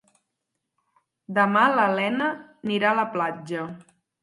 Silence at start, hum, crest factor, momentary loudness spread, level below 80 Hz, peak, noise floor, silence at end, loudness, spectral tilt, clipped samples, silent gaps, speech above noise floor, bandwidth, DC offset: 1.3 s; none; 20 dB; 13 LU; -76 dBFS; -4 dBFS; -81 dBFS; 0.4 s; -23 LUFS; -6 dB/octave; under 0.1%; none; 58 dB; 11.5 kHz; under 0.1%